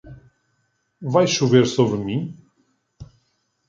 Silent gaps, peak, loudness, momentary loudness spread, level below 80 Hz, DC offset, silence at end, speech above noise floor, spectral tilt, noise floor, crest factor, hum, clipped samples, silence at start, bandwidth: none; -2 dBFS; -19 LUFS; 15 LU; -56 dBFS; under 0.1%; 0.65 s; 51 dB; -5.5 dB/octave; -69 dBFS; 20 dB; none; under 0.1%; 0.05 s; 7.6 kHz